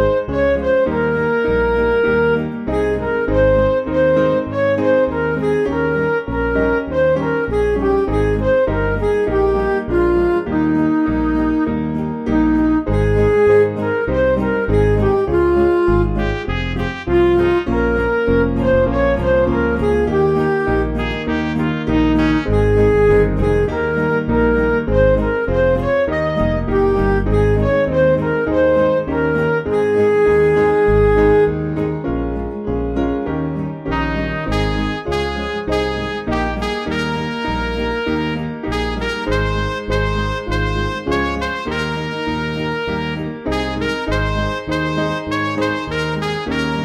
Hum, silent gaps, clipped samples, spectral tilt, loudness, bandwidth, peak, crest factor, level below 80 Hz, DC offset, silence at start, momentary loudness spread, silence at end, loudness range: none; none; under 0.1%; -7.5 dB/octave; -17 LUFS; 11 kHz; -2 dBFS; 14 dB; -28 dBFS; under 0.1%; 0 s; 7 LU; 0 s; 5 LU